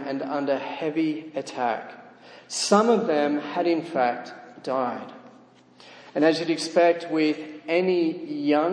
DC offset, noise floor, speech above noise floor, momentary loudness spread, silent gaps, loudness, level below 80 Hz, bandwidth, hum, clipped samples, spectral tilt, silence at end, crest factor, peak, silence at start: under 0.1%; -53 dBFS; 29 dB; 13 LU; none; -24 LUFS; -80 dBFS; 10.5 kHz; none; under 0.1%; -4.5 dB/octave; 0 s; 18 dB; -6 dBFS; 0 s